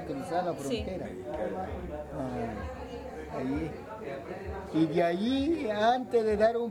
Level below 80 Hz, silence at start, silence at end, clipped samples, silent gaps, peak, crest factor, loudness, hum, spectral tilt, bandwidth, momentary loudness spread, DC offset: -50 dBFS; 0 s; 0 s; under 0.1%; none; -14 dBFS; 18 dB; -32 LUFS; none; -6.5 dB/octave; 16 kHz; 13 LU; under 0.1%